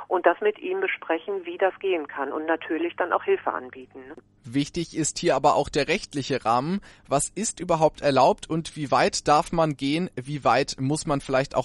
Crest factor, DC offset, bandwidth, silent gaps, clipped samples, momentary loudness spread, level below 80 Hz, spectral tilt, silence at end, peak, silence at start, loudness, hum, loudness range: 20 dB; under 0.1%; 11.5 kHz; none; under 0.1%; 9 LU; -52 dBFS; -4.5 dB/octave; 0 s; -6 dBFS; 0 s; -25 LUFS; none; 4 LU